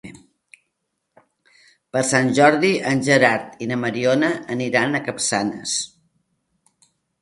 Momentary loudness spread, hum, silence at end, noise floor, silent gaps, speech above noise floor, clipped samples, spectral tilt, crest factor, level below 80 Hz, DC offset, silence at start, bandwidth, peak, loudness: 10 LU; none; 1.35 s; -76 dBFS; none; 57 dB; under 0.1%; -4 dB/octave; 22 dB; -64 dBFS; under 0.1%; 0.05 s; 11.5 kHz; 0 dBFS; -19 LUFS